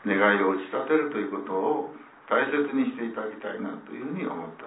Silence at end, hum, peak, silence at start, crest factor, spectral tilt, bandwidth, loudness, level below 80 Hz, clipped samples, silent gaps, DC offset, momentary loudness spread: 0 s; none; -8 dBFS; 0 s; 20 dB; -9.5 dB/octave; 4 kHz; -27 LUFS; -80 dBFS; under 0.1%; none; under 0.1%; 13 LU